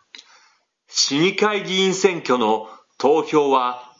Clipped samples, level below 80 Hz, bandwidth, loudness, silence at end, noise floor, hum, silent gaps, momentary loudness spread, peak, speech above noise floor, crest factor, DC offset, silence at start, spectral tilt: under 0.1%; -80 dBFS; 7.8 kHz; -19 LUFS; 0.15 s; -60 dBFS; none; none; 5 LU; 0 dBFS; 41 dB; 20 dB; under 0.1%; 0.9 s; -3.5 dB/octave